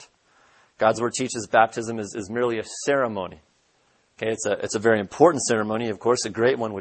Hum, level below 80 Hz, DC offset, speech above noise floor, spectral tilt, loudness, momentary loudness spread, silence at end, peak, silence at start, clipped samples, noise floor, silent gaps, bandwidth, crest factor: none; -64 dBFS; under 0.1%; 42 dB; -4 dB/octave; -23 LUFS; 11 LU; 0 s; -2 dBFS; 0 s; under 0.1%; -64 dBFS; none; 8.8 kHz; 22 dB